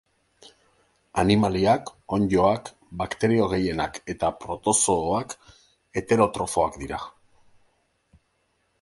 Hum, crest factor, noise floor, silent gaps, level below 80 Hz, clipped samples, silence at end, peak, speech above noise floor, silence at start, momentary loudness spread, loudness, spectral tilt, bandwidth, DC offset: none; 20 dB; -70 dBFS; none; -48 dBFS; under 0.1%; 1.75 s; -4 dBFS; 47 dB; 1.15 s; 13 LU; -24 LUFS; -4.5 dB/octave; 11.5 kHz; under 0.1%